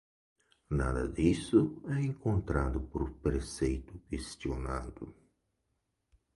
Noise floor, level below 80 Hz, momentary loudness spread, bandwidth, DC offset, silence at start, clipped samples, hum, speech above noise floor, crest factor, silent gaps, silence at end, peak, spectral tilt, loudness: -81 dBFS; -42 dBFS; 12 LU; 11.5 kHz; under 0.1%; 0.7 s; under 0.1%; none; 49 dB; 20 dB; none; 1.25 s; -14 dBFS; -7 dB/octave; -33 LUFS